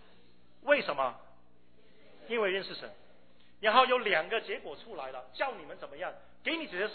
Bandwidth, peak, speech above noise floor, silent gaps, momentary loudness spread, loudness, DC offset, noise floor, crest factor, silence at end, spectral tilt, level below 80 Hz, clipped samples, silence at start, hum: 4.6 kHz; -10 dBFS; 32 dB; none; 17 LU; -32 LUFS; 0.2%; -65 dBFS; 24 dB; 0 s; -6.5 dB/octave; -72 dBFS; under 0.1%; 0.65 s; none